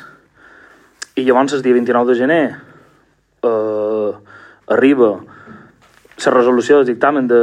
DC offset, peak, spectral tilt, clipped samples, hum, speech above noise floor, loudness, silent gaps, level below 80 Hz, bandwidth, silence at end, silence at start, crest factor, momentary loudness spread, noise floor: under 0.1%; 0 dBFS; -5.5 dB/octave; under 0.1%; none; 43 dB; -14 LUFS; none; -64 dBFS; 10.5 kHz; 0 s; 1.15 s; 16 dB; 12 LU; -56 dBFS